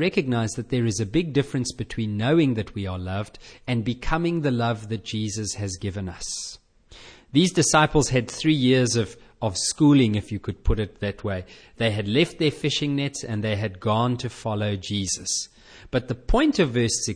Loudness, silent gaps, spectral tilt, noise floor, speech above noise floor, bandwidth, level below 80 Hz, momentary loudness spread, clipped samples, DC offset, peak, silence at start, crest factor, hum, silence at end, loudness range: -24 LUFS; none; -5 dB/octave; -48 dBFS; 25 dB; 10.5 kHz; -38 dBFS; 11 LU; under 0.1%; under 0.1%; -4 dBFS; 0 s; 18 dB; none; 0 s; 6 LU